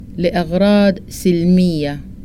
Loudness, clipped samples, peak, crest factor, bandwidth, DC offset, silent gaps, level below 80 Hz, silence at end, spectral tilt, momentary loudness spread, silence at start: -15 LUFS; under 0.1%; -2 dBFS; 12 dB; 16 kHz; under 0.1%; none; -36 dBFS; 0 s; -7 dB/octave; 8 LU; 0 s